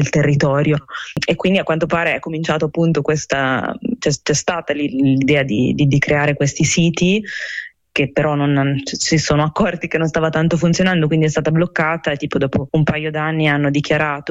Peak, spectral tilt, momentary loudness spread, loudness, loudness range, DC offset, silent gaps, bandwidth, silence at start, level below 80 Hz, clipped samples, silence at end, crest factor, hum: -4 dBFS; -5.5 dB/octave; 5 LU; -17 LUFS; 2 LU; under 0.1%; none; 8.6 kHz; 0 s; -44 dBFS; under 0.1%; 0 s; 12 dB; none